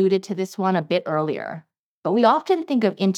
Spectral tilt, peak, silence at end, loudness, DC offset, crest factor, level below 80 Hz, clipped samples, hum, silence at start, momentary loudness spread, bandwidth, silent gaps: -6.5 dB/octave; -4 dBFS; 0 s; -22 LUFS; under 0.1%; 18 dB; -86 dBFS; under 0.1%; none; 0 s; 13 LU; 13.5 kHz; 1.79-2.02 s